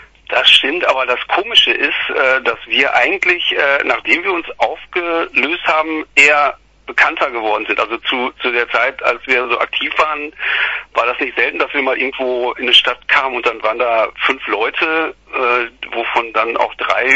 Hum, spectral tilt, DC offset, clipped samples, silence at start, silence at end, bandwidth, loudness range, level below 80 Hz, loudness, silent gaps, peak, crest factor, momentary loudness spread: none; -1.5 dB/octave; under 0.1%; under 0.1%; 0 s; 0 s; 11 kHz; 3 LU; -52 dBFS; -14 LUFS; none; 0 dBFS; 16 dB; 8 LU